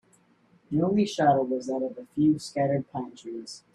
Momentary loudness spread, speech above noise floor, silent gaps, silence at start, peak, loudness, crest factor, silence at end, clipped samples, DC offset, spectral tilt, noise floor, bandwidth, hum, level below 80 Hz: 15 LU; 37 dB; none; 0.7 s; -10 dBFS; -26 LUFS; 18 dB; 0.15 s; under 0.1%; under 0.1%; -6.5 dB/octave; -63 dBFS; 11.5 kHz; none; -66 dBFS